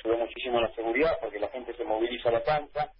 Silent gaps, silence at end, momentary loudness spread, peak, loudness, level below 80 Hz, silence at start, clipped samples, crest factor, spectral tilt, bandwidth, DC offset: none; 0.05 s; 8 LU; -14 dBFS; -29 LUFS; -54 dBFS; 0.05 s; under 0.1%; 14 dB; -9 dB/octave; 5.6 kHz; under 0.1%